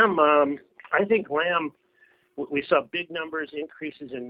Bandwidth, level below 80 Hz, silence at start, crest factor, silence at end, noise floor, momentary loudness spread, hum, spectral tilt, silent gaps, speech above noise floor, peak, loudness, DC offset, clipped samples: 5.2 kHz; -70 dBFS; 0 s; 20 dB; 0 s; -62 dBFS; 16 LU; none; -8 dB/octave; none; 37 dB; -6 dBFS; -25 LUFS; under 0.1%; under 0.1%